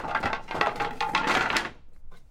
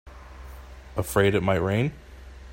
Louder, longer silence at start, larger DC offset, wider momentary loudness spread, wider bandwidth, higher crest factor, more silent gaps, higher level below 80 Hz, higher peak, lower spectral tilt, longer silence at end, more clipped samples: about the same, -27 LUFS vs -25 LUFS; about the same, 0 s vs 0.05 s; neither; second, 6 LU vs 24 LU; about the same, 16.5 kHz vs 16.5 kHz; about the same, 22 dB vs 20 dB; neither; about the same, -48 dBFS vs -44 dBFS; about the same, -8 dBFS vs -6 dBFS; second, -3 dB/octave vs -6 dB/octave; about the same, 0.1 s vs 0 s; neither